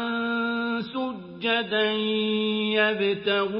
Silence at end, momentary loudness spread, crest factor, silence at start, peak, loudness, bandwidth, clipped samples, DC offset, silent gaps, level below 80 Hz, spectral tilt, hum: 0 s; 8 LU; 18 dB; 0 s; -8 dBFS; -25 LUFS; 5.6 kHz; under 0.1%; under 0.1%; none; -68 dBFS; -9 dB/octave; none